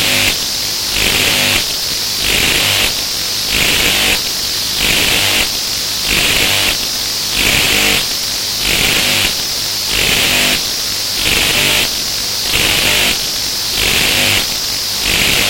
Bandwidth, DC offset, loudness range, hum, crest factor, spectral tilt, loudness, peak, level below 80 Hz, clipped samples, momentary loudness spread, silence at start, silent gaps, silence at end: 17 kHz; under 0.1%; 1 LU; none; 14 dB; -0.5 dB/octave; -11 LUFS; 0 dBFS; -32 dBFS; under 0.1%; 5 LU; 0 s; none; 0 s